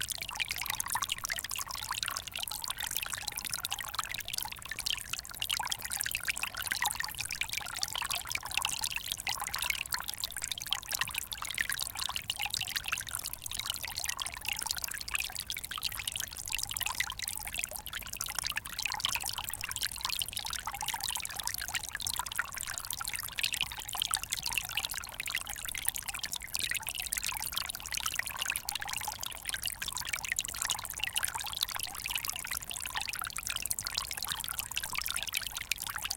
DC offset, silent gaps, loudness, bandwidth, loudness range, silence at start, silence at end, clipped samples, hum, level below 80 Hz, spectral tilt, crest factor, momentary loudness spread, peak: under 0.1%; none; -34 LUFS; 17 kHz; 1 LU; 0 s; 0 s; under 0.1%; none; -56 dBFS; 1 dB/octave; 30 dB; 4 LU; -6 dBFS